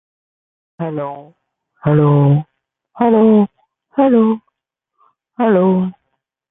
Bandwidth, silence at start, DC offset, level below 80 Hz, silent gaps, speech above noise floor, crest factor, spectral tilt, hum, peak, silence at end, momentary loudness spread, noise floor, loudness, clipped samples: 3.8 kHz; 0.8 s; under 0.1%; -56 dBFS; none; 64 dB; 14 dB; -13.5 dB/octave; none; -2 dBFS; 0.6 s; 13 LU; -76 dBFS; -14 LUFS; under 0.1%